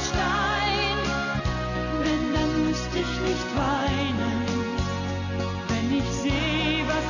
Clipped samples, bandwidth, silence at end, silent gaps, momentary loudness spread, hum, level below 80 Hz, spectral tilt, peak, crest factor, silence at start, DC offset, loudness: under 0.1%; 7.4 kHz; 0 s; none; 5 LU; none; -36 dBFS; -5 dB/octave; -14 dBFS; 12 dB; 0 s; under 0.1%; -26 LUFS